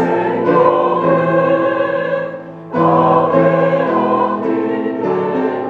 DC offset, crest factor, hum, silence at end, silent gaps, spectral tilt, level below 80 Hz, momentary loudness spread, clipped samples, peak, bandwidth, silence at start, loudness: under 0.1%; 14 dB; none; 0 s; none; -9 dB/octave; -60 dBFS; 7 LU; under 0.1%; 0 dBFS; 6.2 kHz; 0 s; -14 LUFS